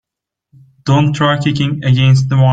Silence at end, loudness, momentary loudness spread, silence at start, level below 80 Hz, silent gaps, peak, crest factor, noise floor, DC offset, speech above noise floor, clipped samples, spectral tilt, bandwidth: 0 s; -13 LUFS; 5 LU; 0.85 s; -46 dBFS; none; 0 dBFS; 12 dB; -75 dBFS; under 0.1%; 63 dB; under 0.1%; -7 dB/octave; 7.8 kHz